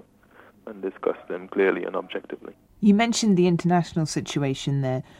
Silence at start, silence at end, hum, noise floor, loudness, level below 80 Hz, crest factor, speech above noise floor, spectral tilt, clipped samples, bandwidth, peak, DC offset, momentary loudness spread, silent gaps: 0.65 s; 0.2 s; none; -54 dBFS; -24 LUFS; -58 dBFS; 18 dB; 30 dB; -6 dB/octave; under 0.1%; 12 kHz; -8 dBFS; under 0.1%; 14 LU; none